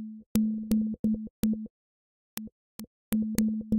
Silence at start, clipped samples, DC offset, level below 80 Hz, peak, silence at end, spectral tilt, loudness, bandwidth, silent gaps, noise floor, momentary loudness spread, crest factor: 0 s; under 0.1%; under 0.1%; -52 dBFS; -4 dBFS; 0 s; -6 dB/octave; -30 LUFS; 17 kHz; 0.26-0.35 s, 0.99-1.04 s, 1.30-1.43 s, 1.70-2.37 s, 2.52-2.79 s, 2.87-3.12 s; under -90 dBFS; 18 LU; 26 dB